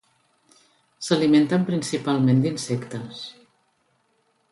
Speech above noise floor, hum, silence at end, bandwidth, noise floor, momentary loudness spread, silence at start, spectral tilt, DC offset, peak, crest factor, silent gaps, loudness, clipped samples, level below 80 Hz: 46 dB; none; 1.2 s; 11.5 kHz; -67 dBFS; 17 LU; 1 s; -6 dB/octave; under 0.1%; -6 dBFS; 18 dB; none; -22 LUFS; under 0.1%; -66 dBFS